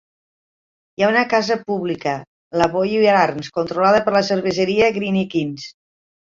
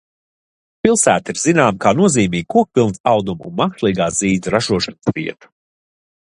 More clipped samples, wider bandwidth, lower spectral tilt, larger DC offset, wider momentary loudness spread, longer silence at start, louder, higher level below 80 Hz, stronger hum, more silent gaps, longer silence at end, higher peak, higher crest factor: neither; second, 7.6 kHz vs 11.5 kHz; about the same, -5.5 dB/octave vs -4.5 dB/octave; neither; first, 12 LU vs 7 LU; first, 1 s vs 0.85 s; about the same, -18 LUFS vs -16 LUFS; second, -56 dBFS vs -48 dBFS; neither; first, 2.27-2.51 s vs 3.00-3.04 s; second, 0.6 s vs 1 s; about the same, -2 dBFS vs 0 dBFS; about the same, 18 dB vs 18 dB